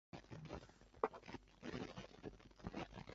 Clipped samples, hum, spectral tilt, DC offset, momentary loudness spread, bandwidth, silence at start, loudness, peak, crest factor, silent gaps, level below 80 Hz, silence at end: under 0.1%; none; -5 dB/octave; under 0.1%; 11 LU; 7.6 kHz; 0.15 s; -52 LUFS; -20 dBFS; 32 dB; none; -66 dBFS; 0 s